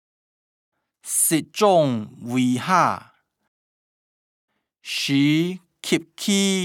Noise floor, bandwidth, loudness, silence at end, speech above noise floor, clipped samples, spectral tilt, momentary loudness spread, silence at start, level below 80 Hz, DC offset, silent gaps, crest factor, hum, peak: under -90 dBFS; 19.5 kHz; -21 LUFS; 0 s; over 70 dB; under 0.1%; -4 dB/octave; 11 LU; 1.05 s; -76 dBFS; under 0.1%; 3.48-4.48 s; 20 dB; none; -4 dBFS